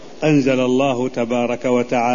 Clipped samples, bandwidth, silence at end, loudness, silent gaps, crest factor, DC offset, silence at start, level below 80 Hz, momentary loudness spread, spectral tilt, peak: under 0.1%; 7.4 kHz; 0 s; -18 LUFS; none; 12 dB; 1%; 0 s; -52 dBFS; 5 LU; -6 dB/octave; -4 dBFS